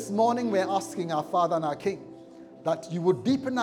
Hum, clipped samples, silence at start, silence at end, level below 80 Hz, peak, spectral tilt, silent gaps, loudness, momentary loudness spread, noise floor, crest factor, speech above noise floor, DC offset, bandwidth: none; under 0.1%; 0 s; 0 s; -72 dBFS; -12 dBFS; -6 dB/octave; none; -27 LUFS; 10 LU; -47 dBFS; 16 dB; 21 dB; under 0.1%; 16 kHz